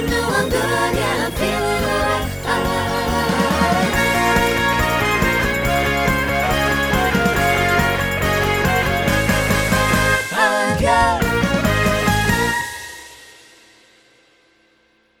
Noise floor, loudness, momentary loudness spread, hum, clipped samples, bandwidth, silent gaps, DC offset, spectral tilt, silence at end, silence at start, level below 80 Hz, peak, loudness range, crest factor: -58 dBFS; -17 LUFS; 4 LU; none; under 0.1%; over 20 kHz; none; under 0.1%; -4.5 dB/octave; 1.95 s; 0 s; -30 dBFS; -2 dBFS; 3 LU; 16 dB